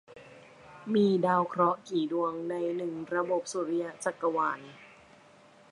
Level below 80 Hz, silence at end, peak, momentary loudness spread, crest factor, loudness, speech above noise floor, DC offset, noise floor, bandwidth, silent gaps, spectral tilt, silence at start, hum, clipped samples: -76 dBFS; 0.85 s; -14 dBFS; 9 LU; 18 dB; -30 LUFS; 28 dB; under 0.1%; -57 dBFS; 11.5 kHz; none; -6 dB/octave; 0.1 s; none; under 0.1%